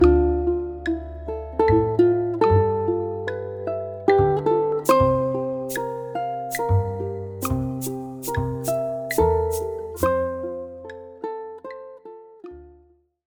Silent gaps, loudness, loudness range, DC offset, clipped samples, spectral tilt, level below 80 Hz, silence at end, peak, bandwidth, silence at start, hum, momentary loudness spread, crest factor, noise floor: none; -23 LUFS; 6 LU; under 0.1%; under 0.1%; -7 dB/octave; -36 dBFS; 0.55 s; -2 dBFS; over 20 kHz; 0 s; none; 18 LU; 20 dB; -58 dBFS